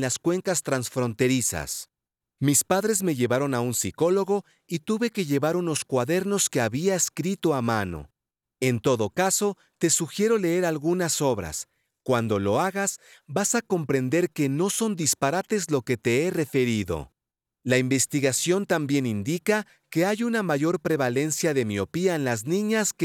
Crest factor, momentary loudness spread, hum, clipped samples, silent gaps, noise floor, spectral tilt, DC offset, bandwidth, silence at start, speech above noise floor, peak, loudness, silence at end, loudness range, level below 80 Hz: 18 dB; 6 LU; none; under 0.1%; none; -88 dBFS; -4.5 dB/octave; under 0.1%; 18.5 kHz; 0 s; 64 dB; -8 dBFS; -25 LUFS; 0 s; 1 LU; -60 dBFS